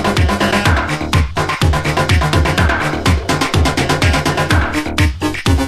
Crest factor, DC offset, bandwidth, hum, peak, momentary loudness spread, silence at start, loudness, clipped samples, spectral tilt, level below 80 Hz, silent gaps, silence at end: 14 dB; under 0.1%; 14 kHz; none; 0 dBFS; 3 LU; 0 s; -14 LUFS; under 0.1%; -5 dB/octave; -20 dBFS; none; 0 s